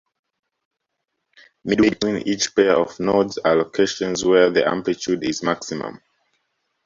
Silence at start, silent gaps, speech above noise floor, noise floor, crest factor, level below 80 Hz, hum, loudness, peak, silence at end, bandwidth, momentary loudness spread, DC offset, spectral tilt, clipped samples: 1.65 s; none; 58 dB; -78 dBFS; 20 dB; -56 dBFS; none; -20 LUFS; -2 dBFS; 0.9 s; 7.8 kHz; 9 LU; under 0.1%; -4 dB/octave; under 0.1%